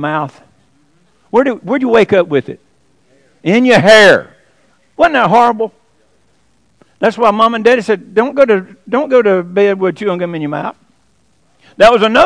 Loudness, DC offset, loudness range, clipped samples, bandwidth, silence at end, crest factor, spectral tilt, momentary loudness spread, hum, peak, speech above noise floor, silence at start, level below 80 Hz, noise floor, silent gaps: -11 LUFS; under 0.1%; 5 LU; 1%; 11 kHz; 0 s; 12 dB; -5 dB/octave; 12 LU; none; 0 dBFS; 46 dB; 0 s; -48 dBFS; -57 dBFS; none